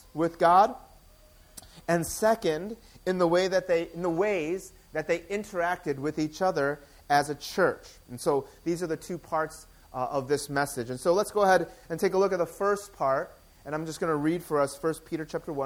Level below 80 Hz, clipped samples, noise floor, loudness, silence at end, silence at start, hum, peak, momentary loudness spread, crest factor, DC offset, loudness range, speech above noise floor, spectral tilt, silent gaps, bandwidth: -58 dBFS; under 0.1%; -56 dBFS; -28 LUFS; 0 s; 0.15 s; none; -8 dBFS; 12 LU; 20 dB; under 0.1%; 3 LU; 28 dB; -5 dB/octave; none; 20 kHz